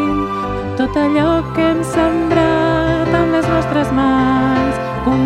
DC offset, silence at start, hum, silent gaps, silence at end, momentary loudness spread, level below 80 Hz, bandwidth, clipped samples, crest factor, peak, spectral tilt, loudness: under 0.1%; 0 s; none; none; 0 s; 5 LU; -32 dBFS; 12.5 kHz; under 0.1%; 14 dB; 0 dBFS; -7 dB/octave; -15 LUFS